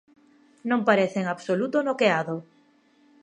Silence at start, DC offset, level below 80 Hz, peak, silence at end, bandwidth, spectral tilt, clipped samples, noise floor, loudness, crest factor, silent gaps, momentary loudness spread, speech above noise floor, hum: 0.65 s; under 0.1%; -80 dBFS; -4 dBFS; 0.8 s; 10 kHz; -6 dB/octave; under 0.1%; -61 dBFS; -24 LUFS; 22 dB; none; 11 LU; 37 dB; none